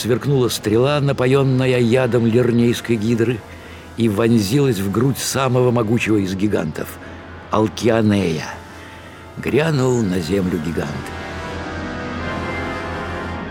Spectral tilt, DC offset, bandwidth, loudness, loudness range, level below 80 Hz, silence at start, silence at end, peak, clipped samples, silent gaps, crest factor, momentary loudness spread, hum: -6 dB/octave; under 0.1%; 18.5 kHz; -18 LUFS; 5 LU; -46 dBFS; 0 s; 0 s; -2 dBFS; under 0.1%; none; 16 dB; 15 LU; none